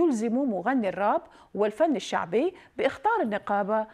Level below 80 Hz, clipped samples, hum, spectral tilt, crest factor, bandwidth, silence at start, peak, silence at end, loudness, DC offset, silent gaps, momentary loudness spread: -68 dBFS; under 0.1%; none; -5.5 dB/octave; 14 dB; 12 kHz; 0 s; -12 dBFS; 0 s; -27 LUFS; under 0.1%; none; 4 LU